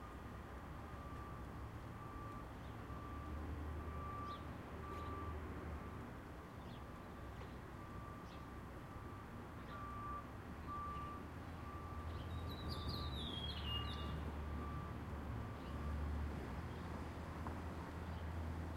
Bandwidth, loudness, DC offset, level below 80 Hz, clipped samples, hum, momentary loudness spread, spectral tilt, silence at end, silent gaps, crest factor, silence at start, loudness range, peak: 16 kHz; -49 LUFS; under 0.1%; -52 dBFS; under 0.1%; none; 8 LU; -6.5 dB/octave; 0 s; none; 16 dB; 0 s; 6 LU; -32 dBFS